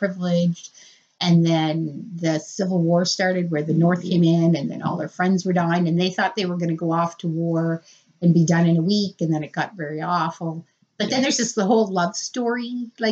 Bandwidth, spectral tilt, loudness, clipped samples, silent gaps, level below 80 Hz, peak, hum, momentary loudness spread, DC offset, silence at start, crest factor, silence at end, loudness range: 7.8 kHz; -5.5 dB/octave; -21 LUFS; under 0.1%; none; -72 dBFS; -6 dBFS; none; 9 LU; under 0.1%; 0 s; 14 dB; 0 s; 2 LU